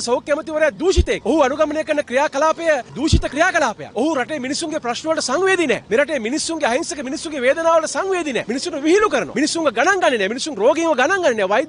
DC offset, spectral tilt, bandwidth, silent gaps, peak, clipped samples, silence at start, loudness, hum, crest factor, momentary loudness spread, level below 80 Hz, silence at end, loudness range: under 0.1%; -4 dB/octave; 11 kHz; none; -2 dBFS; under 0.1%; 0 s; -18 LUFS; none; 16 dB; 6 LU; -34 dBFS; 0 s; 2 LU